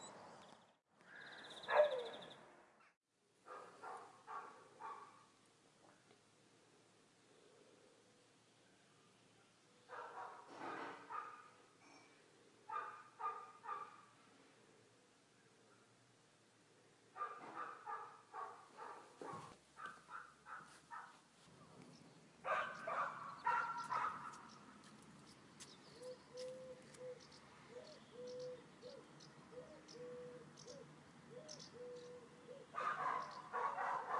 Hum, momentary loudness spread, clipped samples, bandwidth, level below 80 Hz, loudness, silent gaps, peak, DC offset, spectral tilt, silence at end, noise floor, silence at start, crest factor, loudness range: none; 26 LU; under 0.1%; 11.5 kHz; under -90 dBFS; -48 LUFS; 2.97-3.01 s; -22 dBFS; under 0.1%; -3.5 dB/octave; 0 s; -72 dBFS; 0 s; 28 dB; 17 LU